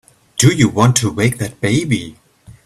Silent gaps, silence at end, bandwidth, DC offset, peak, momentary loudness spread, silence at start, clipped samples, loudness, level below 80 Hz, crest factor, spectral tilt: none; 0.15 s; 13.5 kHz; under 0.1%; 0 dBFS; 9 LU; 0.35 s; under 0.1%; -15 LUFS; -46 dBFS; 16 dB; -5 dB/octave